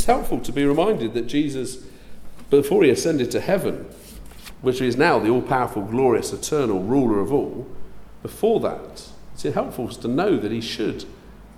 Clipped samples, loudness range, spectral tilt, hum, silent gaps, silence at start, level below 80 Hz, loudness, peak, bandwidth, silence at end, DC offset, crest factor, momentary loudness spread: under 0.1%; 4 LU; -5.5 dB/octave; none; none; 0 s; -42 dBFS; -22 LUFS; -4 dBFS; 16 kHz; 0.1 s; under 0.1%; 18 dB; 21 LU